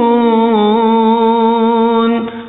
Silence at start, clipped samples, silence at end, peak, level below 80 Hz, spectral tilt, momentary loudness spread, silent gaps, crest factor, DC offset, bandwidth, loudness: 0 s; under 0.1%; 0 s; 0 dBFS; -56 dBFS; -4.5 dB/octave; 1 LU; none; 10 dB; 0.3%; 4.1 kHz; -11 LUFS